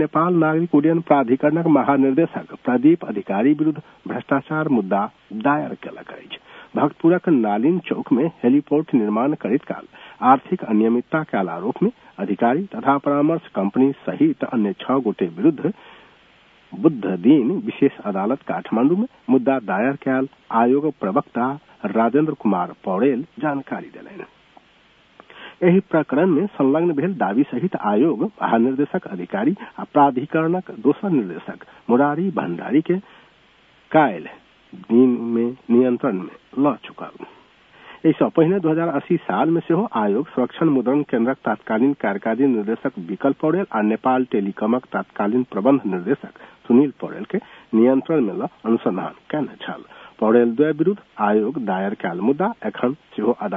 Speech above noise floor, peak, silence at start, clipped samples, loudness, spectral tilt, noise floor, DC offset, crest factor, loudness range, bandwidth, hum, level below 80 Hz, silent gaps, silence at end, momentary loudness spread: 35 dB; 0 dBFS; 0 s; under 0.1%; -20 LUFS; -10.5 dB/octave; -55 dBFS; under 0.1%; 20 dB; 3 LU; 3.8 kHz; none; -68 dBFS; none; 0 s; 11 LU